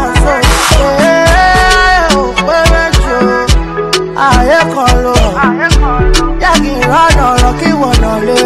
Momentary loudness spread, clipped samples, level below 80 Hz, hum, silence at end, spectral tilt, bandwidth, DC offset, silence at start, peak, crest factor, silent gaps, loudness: 4 LU; 0.2%; -14 dBFS; none; 0 s; -4.5 dB/octave; 14.5 kHz; under 0.1%; 0 s; 0 dBFS; 8 dB; none; -8 LUFS